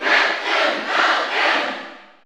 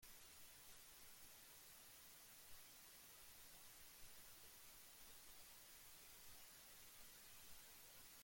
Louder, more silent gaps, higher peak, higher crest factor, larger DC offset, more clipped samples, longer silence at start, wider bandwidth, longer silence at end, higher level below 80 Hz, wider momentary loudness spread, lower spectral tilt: first, -18 LUFS vs -61 LUFS; neither; first, -4 dBFS vs -48 dBFS; about the same, 16 dB vs 14 dB; neither; neither; about the same, 0 s vs 0 s; first, over 20 kHz vs 17 kHz; first, 0.2 s vs 0 s; about the same, -74 dBFS vs -78 dBFS; first, 11 LU vs 1 LU; about the same, -0.5 dB/octave vs -0.5 dB/octave